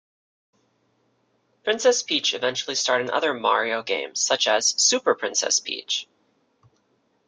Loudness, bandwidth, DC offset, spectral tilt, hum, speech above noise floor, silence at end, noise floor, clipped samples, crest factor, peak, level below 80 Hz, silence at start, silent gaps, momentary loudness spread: -22 LUFS; 11 kHz; under 0.1%; 0 dB/octave; none; 45 dB; 1.25 s; -67 dBFS; under 0.1%; 20 dB; -6 dBFS; -76 dBFS; 1.65 s; none; 8 LU